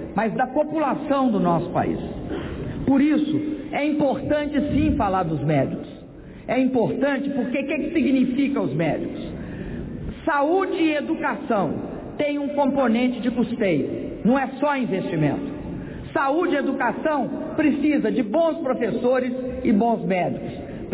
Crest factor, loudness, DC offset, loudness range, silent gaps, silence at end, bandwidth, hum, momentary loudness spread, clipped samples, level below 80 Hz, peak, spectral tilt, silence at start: 14 dB; -23 LUFS; under 0.1%; 2 LU; none; 0 s; 4 kHz; none; 11 LU; under 0.1%; -44 dBFS; -10 dBFS; -11 dB/octave; 0 s